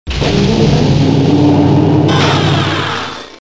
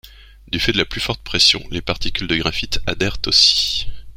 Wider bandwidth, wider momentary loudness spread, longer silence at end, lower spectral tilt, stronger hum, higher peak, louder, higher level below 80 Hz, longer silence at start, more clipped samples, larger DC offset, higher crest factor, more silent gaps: second, 8 kHz vs 16.5 kHz; second, 6 LU vs 11 LU; about the same, 0.05 s vs 0 s; first, -6.5 dB/octave vs -2.5 dB/octave; neither; about the same, 0 dBFS vs 0 dBFS; first, -11 LUFS vs -17 LUFS; about the same, -28 dBFS vs -32 dBFS; about the same, 0.05 s vs 0.05 s; neither; first, 1% vs under 0.1%; second, 10 dB vs 18 dB; neither